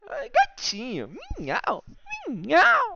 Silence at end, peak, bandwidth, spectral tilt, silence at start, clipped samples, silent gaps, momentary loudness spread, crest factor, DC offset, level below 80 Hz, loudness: 0 s; -10 dBFS; 7.8 kHz; -3 dB/octave; 0.05 s; under 0.1%; none; 18 LU; 16 dB; under 0.1%; -48 dBFS; -24 LUFS